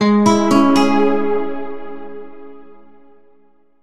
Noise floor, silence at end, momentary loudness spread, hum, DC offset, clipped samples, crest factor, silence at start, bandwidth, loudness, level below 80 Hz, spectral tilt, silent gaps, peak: -56 dBFS; 0 s; 22 LU; none; under 0.1%; under 0.1%; 16 dB; 0 s; 13.5 kHz; -14 LUFS; -54 dBFS; -6 dB/octave; none; 0 dBFS